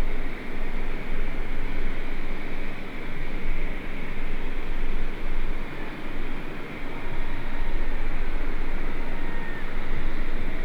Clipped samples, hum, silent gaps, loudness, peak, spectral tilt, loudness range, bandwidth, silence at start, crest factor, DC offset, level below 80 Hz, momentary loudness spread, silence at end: under 0.1%; none; none; -34 LUFS; -12 dBFS; -6.5 dB/octave; 1 LU; 4.3 kHz; 0 s; 8 dB; under 0.1%; -26 dBFS; 3 LU; 0 s